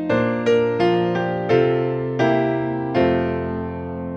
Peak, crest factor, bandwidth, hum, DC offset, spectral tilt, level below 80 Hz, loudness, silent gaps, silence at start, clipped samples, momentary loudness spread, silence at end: -4 dBFS; 16 dB; 7.4 kHz; none; under 0.1%; -8 dB/octave; -48 dBFS; -20 LUFS; none; 0 s; under 0.1%; 8 LU; 0 s